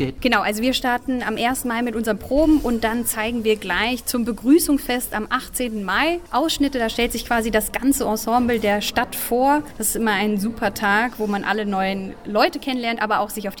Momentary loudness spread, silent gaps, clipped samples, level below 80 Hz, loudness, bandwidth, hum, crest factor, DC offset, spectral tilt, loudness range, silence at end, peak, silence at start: 6 LU; none; under 0.1%; -40 dBFS; -21 LUFS; 19 kHz; none; 16 dB; 0.4%; -3.5 dB/octave; 1 LU; 0 s; -4 dBFS; 0 s